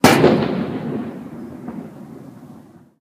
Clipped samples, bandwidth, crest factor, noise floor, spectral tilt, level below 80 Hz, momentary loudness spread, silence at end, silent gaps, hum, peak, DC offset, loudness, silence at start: under 0.1%; 15.5 kHz; 20 dB; -44 dBFS; -5 dB/octave; -52 dBFS; 25 LU; 0.4 s; none; none; 0 dBFS; under 0.1%; -18 LUFS; 0.05 s